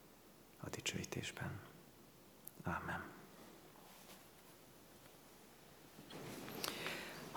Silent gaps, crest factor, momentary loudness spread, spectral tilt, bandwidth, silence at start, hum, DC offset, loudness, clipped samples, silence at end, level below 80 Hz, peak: none; 32 dB; 18 LU; -3.5 dB/octave; over 20 kHz; 0 s; none; under 0.1%; -47 LUFS; under 0.1%; 0 s; -76 dBFS; -20 dBFS